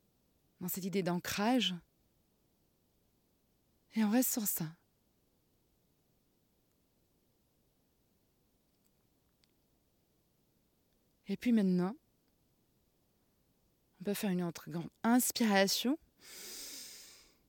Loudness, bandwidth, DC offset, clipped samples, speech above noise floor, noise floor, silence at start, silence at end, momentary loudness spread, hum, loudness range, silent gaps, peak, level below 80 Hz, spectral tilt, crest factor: -34 LUFS; 18 kHz; under 0.1%; under 0.1%; 42 dB; -75 dBFS; 0.6 s; 0.35 s; 17 LU; none; 7 LU; none; -16 dBFS; -78 dBFS; -4 dB/octave; 24 dB